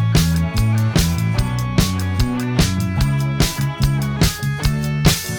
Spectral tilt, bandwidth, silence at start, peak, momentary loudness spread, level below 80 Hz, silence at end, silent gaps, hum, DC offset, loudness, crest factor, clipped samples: -5 dB/octave; 19.5 kHz; 0 s; -2 dBFS; 4 LU; -26 dBFS; 0 s; none; none; under 0.1%; -18 LUFS; 16 dB; under 0.1%